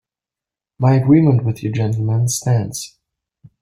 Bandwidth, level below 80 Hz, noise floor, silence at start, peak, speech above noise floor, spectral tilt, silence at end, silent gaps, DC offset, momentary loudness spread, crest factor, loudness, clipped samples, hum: 15.5 kHz; -52 dBFS; -88 dBFS; 0.8 s; -2 dBFS; 73 dB; -6.5 dB/octave; 0.75 s; none; under 0.1%; 13 LU; 16 dB; -16 LUFS; under 0.1%; none